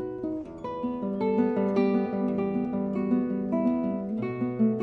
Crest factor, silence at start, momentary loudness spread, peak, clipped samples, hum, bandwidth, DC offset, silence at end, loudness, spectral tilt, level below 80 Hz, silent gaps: 16 dB; 0 s; 8 LU; -12 dBFS; under 0.1%; none; 4.7 kHz; under 0.1%; 0 s; -28 LUFS; -10 dB/octave; -58 dBFS; none